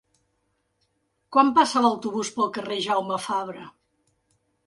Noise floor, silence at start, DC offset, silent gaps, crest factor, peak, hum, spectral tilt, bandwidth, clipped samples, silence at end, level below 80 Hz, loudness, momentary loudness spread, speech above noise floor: -73 dBFS; 1.3 s; under 0.1%; none; 20 dB; -6 dBFS; none; -3.5 dB/octave; 11.5 kHz; under 0.1%; 1 s; -72 dBFS; -23 LUFS; 10 LU; 50 dB